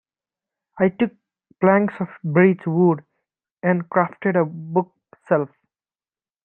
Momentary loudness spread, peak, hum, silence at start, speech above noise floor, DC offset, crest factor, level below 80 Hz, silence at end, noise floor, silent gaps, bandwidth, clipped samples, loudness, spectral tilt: 8 LU; -2 dBFS; none; 0.75 s; over 71 dB; under 0.1%; 20 dB; -68 dBFS; 1 s; under -90 dBFS; 3.51-3.55 s; 3.6 kHz; under 0.1%; -21 LUFS; -11 dB/octave